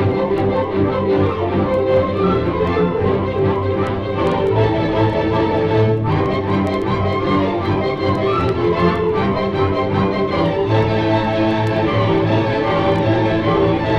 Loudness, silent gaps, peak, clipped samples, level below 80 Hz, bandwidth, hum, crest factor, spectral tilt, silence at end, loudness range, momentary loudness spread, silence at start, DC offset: -17 LUFS; none; -4 dBFS; under 0.1%; -36 dBFS; 7.4 kHz; none; 12 dB; -8.5 dB/octave; 0 s; 1 LU; 2 LU; 0 s; under 0.1%